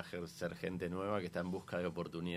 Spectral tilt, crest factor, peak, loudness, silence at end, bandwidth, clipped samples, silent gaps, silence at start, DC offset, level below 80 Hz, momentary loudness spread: -6.5 dB/octave; 18 dB; -22 dBFS; -41 LUFS; 0 s; 15 kHz; under 0.1%; none; 0 s; under 0.1%; -66 dBFS; 4 LU